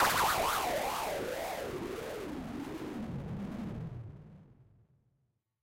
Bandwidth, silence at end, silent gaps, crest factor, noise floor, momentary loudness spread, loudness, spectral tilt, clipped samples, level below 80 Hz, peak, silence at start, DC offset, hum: 16 kHz; 1 s; none; 18 dB; -79 dBFS; 15 LU; -36 LUFS; -3.5 dB/octave; under 0.1%; -56 dBFS; -18 dBFS; 0 s; under 0.1%; none